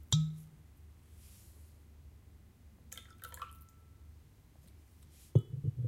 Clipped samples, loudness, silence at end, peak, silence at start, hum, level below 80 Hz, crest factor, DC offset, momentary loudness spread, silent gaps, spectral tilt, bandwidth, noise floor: under 0.1%; -37 LUFS; 0 s; -14 dBFS; 0 s; none; -58 dBFS; 26 dB; under 0.1%; 27 LU; none; -5.5 dB/octave; 16.5 kHz; -60 dBFS